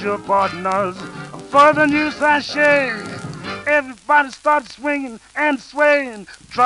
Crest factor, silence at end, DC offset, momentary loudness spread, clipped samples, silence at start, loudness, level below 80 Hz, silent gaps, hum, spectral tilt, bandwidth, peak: 18 dB; 0 s; under 0.1%; 16 LU; under 0.1%; 0 s; -17 LUFS; -54 dBFS; none; none; -4.5 dB/octave; 11.5 kHz; 0 dBFS